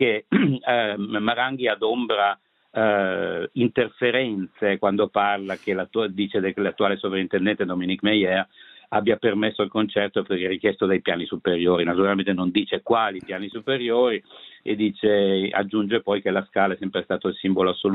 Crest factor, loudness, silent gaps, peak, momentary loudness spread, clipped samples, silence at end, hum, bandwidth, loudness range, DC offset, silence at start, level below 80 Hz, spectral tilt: 18 dB; -23 LUFS; none; -4 dBFS; 6 LU; under 0.1%; 0 s; none; 4.6 kHz; 1 LU; under 0.1%; 0 s; -66 dBFS; -8.5 dB/octave